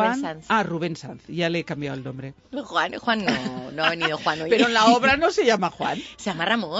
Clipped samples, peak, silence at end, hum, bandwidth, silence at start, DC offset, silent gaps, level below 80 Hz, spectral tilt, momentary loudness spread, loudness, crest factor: under 0.1%; -4 dBFS; 0 s; none; 8 kHz; 0 s; under 0.1%; none; -56 dBFS; -4.5 dB/octave; 16 LU; -22 LUFS; 18 dB